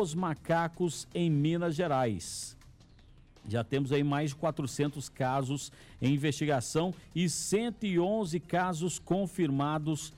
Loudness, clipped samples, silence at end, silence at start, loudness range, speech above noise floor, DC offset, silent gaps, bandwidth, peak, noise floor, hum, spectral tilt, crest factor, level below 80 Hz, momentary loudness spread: -32 LUFS; under 0.1%; 0 s; 0 s; 2 LU; 26 dB; under 0.1%; none; 16 kHz; -20 dBFS; -57 dBFS; none; -5.5 dB/octave; 12 dB; -60 dBFS; 6 LU